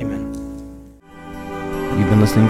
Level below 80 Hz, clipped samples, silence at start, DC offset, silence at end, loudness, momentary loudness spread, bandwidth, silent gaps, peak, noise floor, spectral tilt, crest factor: -36 dBFS; under 0.1%; 0 s; under 0.1%; 0 s; -20 LUFS; 23 LU; 15 kHz; none; 0 dBFS; -40 dBFS; -7.5 dB/octave; 18 dB